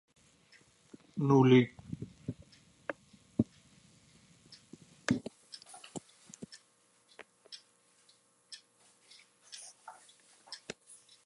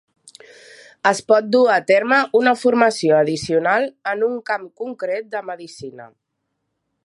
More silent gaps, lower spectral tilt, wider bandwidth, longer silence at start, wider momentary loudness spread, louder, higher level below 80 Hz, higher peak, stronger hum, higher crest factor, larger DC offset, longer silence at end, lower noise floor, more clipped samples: neither; first, -6.5 dB/octave vs -4.5 dB/octave; about the same, 11.5 kHz vs 11.5 kHz; about the same, 1.15 s vs 1.05 s; first, 29 LU vs 16 LU; second, -32 LUFS vs -18 LUFS; second, -68 dBFS vs -62 dBFS; second, -12 dBFS vs 0 dBFS; neither; first, 24 dB vs 18 dB; neither; second, 0.7 s vs 1 s; second, -69 dBFS vs -75 dBFS; neither